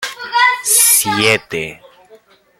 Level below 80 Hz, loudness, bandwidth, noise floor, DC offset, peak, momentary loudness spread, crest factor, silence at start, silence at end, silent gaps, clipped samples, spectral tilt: -56 dBFS; -11 LUFS; over 20 kHz; -47 dBFS; under 0.1%; 0 dBFS; 15 LU; 16 dB; 0 s; 0.85 s; none; under 0.1%; -1 dB/octave